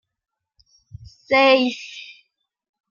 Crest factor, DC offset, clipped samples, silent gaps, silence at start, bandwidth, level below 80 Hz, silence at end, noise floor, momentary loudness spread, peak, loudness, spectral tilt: 22 dB; under 0.1%; under 0.1%; none; 1.3 s; 7.2 kHz; -58 dBFS; 0.85 s; -65 dBFS; 23 LU; -2 dBFS; -17 LUFS; -4 dB/octave